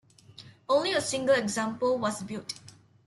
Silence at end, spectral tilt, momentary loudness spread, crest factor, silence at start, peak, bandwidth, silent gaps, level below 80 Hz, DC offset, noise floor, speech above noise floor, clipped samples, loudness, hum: 0.35 s; -3.5 dB/octave; 14 LU; 16 dB; 0.4 s; -12 dBFS; 12.5 kHz; none; -68 dBFS; under 0.1%; -52 dBFS; 24 dB; under 0.1%; -28 LUFS; none